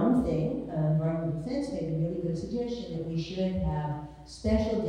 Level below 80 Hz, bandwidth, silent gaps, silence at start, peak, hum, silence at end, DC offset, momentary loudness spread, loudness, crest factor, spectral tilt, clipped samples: -44 dBFS; 10 kHz; none; 0 s; -14 dBFS; none; 0 s; under 0.1%; 7 LU; -31 LUFS; 16 dB; -8 dB/octave; under 0.1%